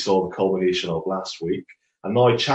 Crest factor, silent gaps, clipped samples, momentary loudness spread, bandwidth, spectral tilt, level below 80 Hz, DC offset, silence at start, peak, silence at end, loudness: 16 dB; none; under 0.1%; 10 LU; 8.4 kHz; -5.5 dB/octave; -58 dBFS; under 0.1%; 0 s; -6 dBFS; 0 s; -23 LUFS